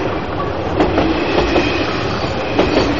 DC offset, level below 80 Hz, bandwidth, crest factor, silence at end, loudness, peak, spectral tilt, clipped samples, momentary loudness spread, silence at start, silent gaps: 3%; -30 dBFS; 7.4 kHz; 14 dB; 0 s; -17 LUFS; -2 dBFS; -4 dB/octave; under 0.1%; 6 LU; 0 s; none